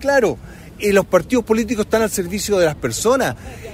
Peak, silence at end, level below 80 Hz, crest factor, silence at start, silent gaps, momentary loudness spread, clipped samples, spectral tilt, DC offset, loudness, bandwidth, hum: -2 dBFS; 0 s; -42 dBFS; 16 dB; 0 s; none; 7 LU; under 0.1%; -4.5 dB/octave; under 0.1%; -18 LUFS; 16 kHz; none